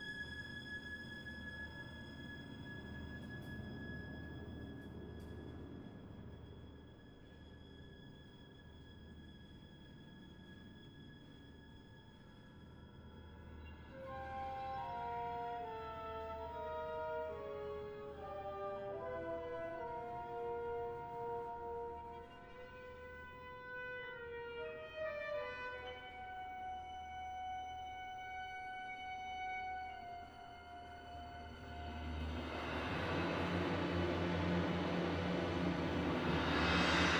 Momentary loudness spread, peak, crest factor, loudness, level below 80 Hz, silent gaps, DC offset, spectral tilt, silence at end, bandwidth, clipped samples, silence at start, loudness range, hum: 19 LU; -20 dBFS; 24 dB; -44 LUFS; -58 dBFS; none; under 0.1%; -6 dB/octave; 0 s; 19.5 kHz; under 0.1%; 0 s; 19 LU; none